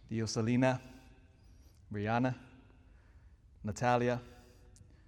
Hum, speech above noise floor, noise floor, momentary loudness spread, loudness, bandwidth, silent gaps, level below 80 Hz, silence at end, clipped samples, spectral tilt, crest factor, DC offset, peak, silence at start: none; 27 dB; -60 dBFS; 16 LU; -34 LUFS; 11 kHz; none; -62 dBFS; 0.65 s; under 0.1%; -6 dB/octave; 20 dB; under 0.1%; -16 dBFS; 0.1 s